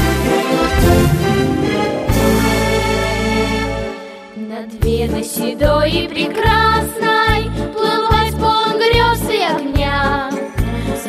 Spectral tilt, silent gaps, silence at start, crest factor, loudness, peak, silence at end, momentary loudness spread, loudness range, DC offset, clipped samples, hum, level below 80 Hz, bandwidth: -5 dB/octave; none; 0 s; 14 dB; -15 LUFS; -2 dBFS; 0 s; 8 LU; 4 LU; under 0.1%; under 0.1%; none; -26 dBFS; 16 kHz